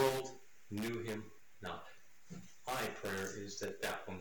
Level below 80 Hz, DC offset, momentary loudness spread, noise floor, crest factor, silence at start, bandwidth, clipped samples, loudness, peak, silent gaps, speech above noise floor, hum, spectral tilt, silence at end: -70 dBFS; 0.2%; 16 LU; -61 dBFS; 22 dB; 0 s; 19 kHz; under 0.1%; -42 LUFS; -20 dBFS; none; 19 dB; none; -4 dB/octave; 0 s